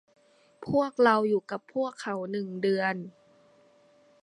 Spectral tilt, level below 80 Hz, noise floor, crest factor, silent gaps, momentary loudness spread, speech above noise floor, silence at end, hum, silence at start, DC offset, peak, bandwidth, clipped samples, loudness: -6.5 dB/octave; -72 dBFS; -61 dBFS; 22 dB; none; 13 LU; 34 dB; 1.15 s; none; 0.6 s; under 0.1%; -8 dBFS; 11 kHz; under 0.1%; -28 LUFS